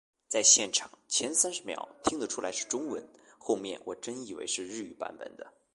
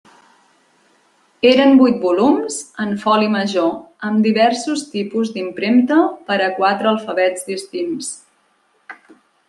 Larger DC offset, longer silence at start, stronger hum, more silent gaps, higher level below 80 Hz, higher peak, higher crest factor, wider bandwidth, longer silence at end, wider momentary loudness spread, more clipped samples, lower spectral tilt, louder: neither; second, 0.3 s vs 1.45 s; neither; neither; second, -70 dBFS vs -64 dBFS; second, -8 dBFS vs -2 dBFS; first, 26 dB vs 16 dB; about the same, 11.5 kHz vs 12 kHz; second, 0.25 s vs 0.55 s; first, 19 LU vs 12 LU; neither; second, -0.5 dB/octave vs -4.5 dB/octave; second, -29 LUFS vs -16 LUFS